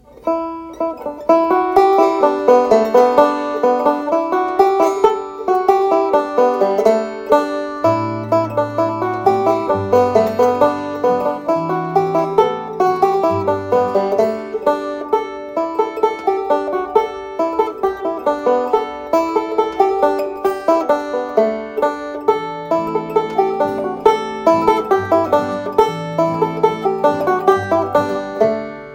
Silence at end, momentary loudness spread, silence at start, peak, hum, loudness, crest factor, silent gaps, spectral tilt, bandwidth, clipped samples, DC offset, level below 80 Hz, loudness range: 0 s; 7 LU; 0.2 s; 0 dBFS; none; -16 LUFS; 16 dB; none; -6.5 dB/octave; 16.5 kHz; under 0.1%; under 0.1%; -54 dBFS; 4 LU